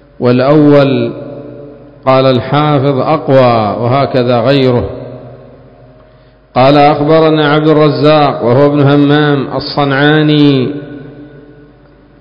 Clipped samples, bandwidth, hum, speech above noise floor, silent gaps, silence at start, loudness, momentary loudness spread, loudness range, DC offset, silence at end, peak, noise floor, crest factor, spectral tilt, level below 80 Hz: 0.8%; 5.4 kHz; none; 34 dB; none; 0.2 s; -9 LUFS; 15 LU; 4 LU; under 0.1%; 0.8 s; 0 dBFS; -42 dBFS; 10 dB; -9.5 dB/octave; -40 dBFS